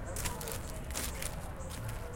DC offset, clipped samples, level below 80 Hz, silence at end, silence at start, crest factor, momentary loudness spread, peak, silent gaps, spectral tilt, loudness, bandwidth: under 0.1%; under 0.1%; -44 dBFS; 0 s; 0 s; 20 dB; 5 LU; -18 dBFS; none; -3.5 dB/octave; -40 LUFS; 17 kHz